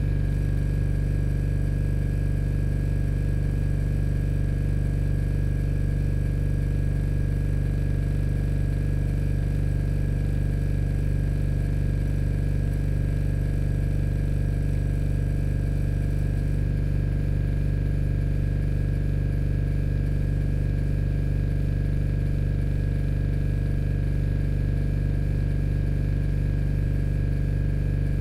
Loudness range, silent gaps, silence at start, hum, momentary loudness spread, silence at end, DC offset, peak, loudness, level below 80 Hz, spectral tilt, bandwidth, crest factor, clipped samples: 0 LU; none; 0 s; none; 0 LU; 0 s; under 0.1%; -14 dBFS; -26 LUFS; -26 dBFS; -9 dB/octave; 11.5 kHz; 8 dB; under 0.1%